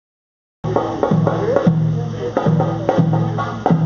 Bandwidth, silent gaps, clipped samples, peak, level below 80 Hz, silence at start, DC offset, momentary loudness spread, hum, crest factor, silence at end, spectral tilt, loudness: 6.8 kHz; none; under 0.1%; 0 dBFS; -46 dBFS; 0.65 s; under 0.1%; 6 LU; none; 18 dB; 0 s; -8.5 dB/octave; -18 LUFS